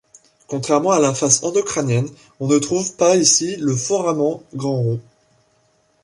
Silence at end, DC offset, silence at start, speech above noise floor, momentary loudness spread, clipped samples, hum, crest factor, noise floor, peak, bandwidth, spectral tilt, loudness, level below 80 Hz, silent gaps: 1.05 s; under 0.1%; 0.5 s; 43 dB; 12 LU; under 0.1%; none; 20 dB; -61 dBFS; 0 dBFS; 11.5 kHz; -4 dB/octave; -18 LUFS; -58 dBFS; none